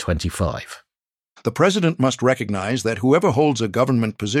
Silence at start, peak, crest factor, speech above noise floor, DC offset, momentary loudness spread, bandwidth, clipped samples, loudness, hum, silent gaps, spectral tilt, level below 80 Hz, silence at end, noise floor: 0 s; -4 dBFS; 16 dB; over 71 dB; under 0.1%; 9 LU; 15.5 kHz; under 0.1%; -20 LUFS; none; none; -5.5 dB/octave; -40 dBFS; 0 s; under -90 dBFS